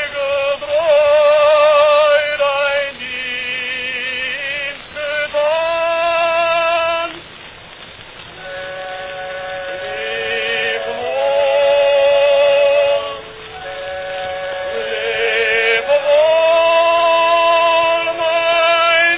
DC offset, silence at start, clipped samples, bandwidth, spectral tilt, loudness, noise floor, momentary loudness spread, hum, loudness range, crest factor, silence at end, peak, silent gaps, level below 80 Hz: under 0.1%; 0 s; under 0.1%; 4 kHz; -6 dB/octave; -15 LUFS; -36 dBFS; 15 LU; none; 9 LU; 14 dB; 0 s; -2 dBFS; none; -52 dBFS